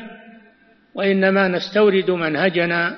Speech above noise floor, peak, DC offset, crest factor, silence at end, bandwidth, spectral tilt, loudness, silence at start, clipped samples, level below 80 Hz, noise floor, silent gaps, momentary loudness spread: 36 dB; -4 dBFS; under 0.1%; 16 dB; 0 s; 6.2 kHz; -4 dB/octave; -18 LUFS; 0 s; under 0.1%; -64 dBFS; -53 dBFS; none; 7 LU